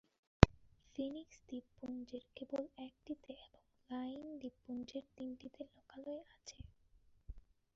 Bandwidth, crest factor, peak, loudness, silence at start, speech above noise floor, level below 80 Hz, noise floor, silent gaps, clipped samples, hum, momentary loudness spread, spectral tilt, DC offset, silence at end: 7.4 kHz; 40 dB; -2 dBFS; -41 LUFS; 0.4 s; 21 dB; -52 dBFS; -70 dBFS; none; under 0.1%; none; 22 LU; -6 dB/octave; under 0.1%; 0.35 s